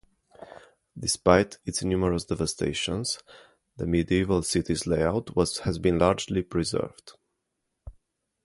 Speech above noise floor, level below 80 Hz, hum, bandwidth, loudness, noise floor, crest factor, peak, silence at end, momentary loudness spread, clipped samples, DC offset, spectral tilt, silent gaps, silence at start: 54 dB; -44 dBFS; none; 11.5 kHz; -26 LUFS; -80 dBFS; 24 dB; -4 dBFS; 0.55 s; 9 LU; under 0.1%; under 0.1%; -5 dB/octave; none; 0.4 s